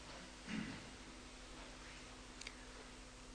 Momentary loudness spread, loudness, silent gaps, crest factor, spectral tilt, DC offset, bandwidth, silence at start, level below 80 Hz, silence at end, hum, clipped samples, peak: 8 LU; -52 LUFS; none; 24 dB; -3.5 dB/octave; under 0.1%; 10.5 kHz; 0 s; -62 dBFS; 0 s; none; under 0.1%; -28 dBFS